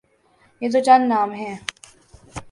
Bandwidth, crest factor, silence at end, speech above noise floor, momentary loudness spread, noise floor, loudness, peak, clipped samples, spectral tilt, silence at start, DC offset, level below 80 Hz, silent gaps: 11.5 kHz; 20 dB; 0.1 s; 41 dB; 21 LU; -59 dBFS; -19 LUFS; -2 dBFS; under 0.1%; -4.5 dB/octave; 0.6 s; under 0.1%; -54 dBFS; none